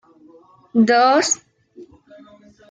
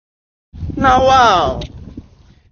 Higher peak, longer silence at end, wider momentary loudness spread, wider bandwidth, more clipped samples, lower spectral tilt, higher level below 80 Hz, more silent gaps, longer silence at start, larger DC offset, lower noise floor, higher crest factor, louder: second, -4 dBFS vs 0 dBFS; first, 0.85 s vs 0.5 s; second, 9 LU vs 20 LU; first, 9.6 kHz vs 7 kHz; neither; second, -3 dB/octave vs -4.5 dB/octave; second, -68 dBFS vs -32 dBFS; neither; first, 0.75 s vs 0.55 s; neither; about the same, -49 dBFS vs -46 dBFS; about the same, 16 dB vs 16 dB; second, -16 LUFS vs -12 LUFS